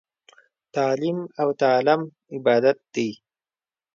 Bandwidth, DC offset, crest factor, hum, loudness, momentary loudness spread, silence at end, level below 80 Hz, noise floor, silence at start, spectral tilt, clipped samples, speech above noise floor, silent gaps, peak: 7.4 kHz; under 0.1%; 18 dB; none; -23 LUFS; 10 LU; 0.8 s; -74 dBFS; under -90 dBFS; 0.75 s; -6 dB/octave; under 0.1%; over 68 dB; none; -6 dBFS